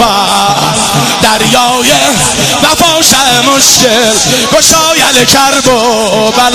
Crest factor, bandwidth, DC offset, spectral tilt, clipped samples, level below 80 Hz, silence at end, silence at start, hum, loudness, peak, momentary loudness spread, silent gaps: 6 dB; 16 kHz; 0.5%; -2 dB/octave; 2%; -34 dBFS; 0 s; 0 s; none; -5 LUFS; 0 dBFS; 4 LU; none